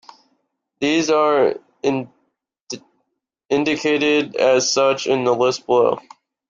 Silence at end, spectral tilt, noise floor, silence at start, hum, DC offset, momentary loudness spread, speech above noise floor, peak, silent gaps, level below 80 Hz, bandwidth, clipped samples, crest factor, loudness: 0.5 s; -3.5 dB/octave; -74 dBFS; 0.8 s; none; under 0.1%; 15 LU; 57 dB; -4 dBFS; 2.60-2.67 s; -64 dBFS; 7.6 kHz; under 0.1%; 16 dB; -18 LUFS